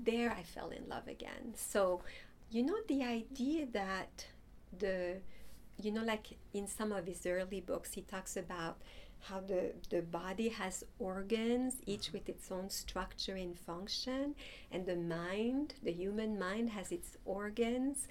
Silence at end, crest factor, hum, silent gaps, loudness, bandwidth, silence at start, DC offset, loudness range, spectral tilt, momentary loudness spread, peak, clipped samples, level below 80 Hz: 0 s; 18 dB; none; none; -40 LUFS; 17.5 kHz; 0 s; under 0.1%; 3 LU; -4 dB/octave; 11 LU; -22 dBFS; under 0.1%; -58 dBFS